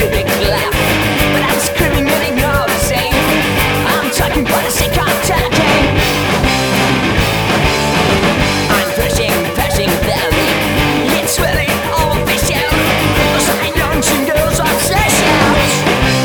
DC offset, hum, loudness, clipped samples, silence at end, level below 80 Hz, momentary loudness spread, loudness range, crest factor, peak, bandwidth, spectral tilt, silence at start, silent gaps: under 0.1%; none; -12 LUFS; under 0.1%; 0 s; -24 dBFS; 3 LU; 1 LU; 12 dB; 0 dBFS; over 20 kHz; -4 dB/octave; 0 s; none